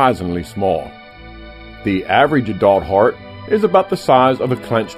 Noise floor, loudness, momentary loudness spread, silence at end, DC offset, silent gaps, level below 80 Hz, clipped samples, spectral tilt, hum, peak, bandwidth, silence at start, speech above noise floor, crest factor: -36 dBFS; -16 LUFS; 21 LU; 0 s; under 0.1%; none; -42 dBFS; under 0.1%; -6.5 dB/octave; none; 0 dBFS; 15.5 kHz; 0 s; 21 dB; 16 dB